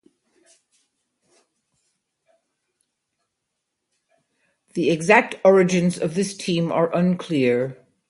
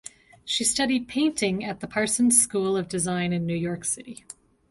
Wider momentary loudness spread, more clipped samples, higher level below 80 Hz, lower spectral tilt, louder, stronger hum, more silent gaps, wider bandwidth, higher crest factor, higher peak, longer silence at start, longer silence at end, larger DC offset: second, 9 LU vs 13 LU; neither; second, -66 dBFS vs -58 dBFS; first, -6 dB/octave vs -3.5 dB/octave; first, -20 LUFS vs -24 LUFS; neither; neither; about the same, 11.5 kHz vs 12 kHz; about the same, 22 dB vs 22 dB; first, 0 dBFS vs -4 dBFS; first, 4.75 s vs 0.45 s; second, 0.35 s vs 0.55 s; neither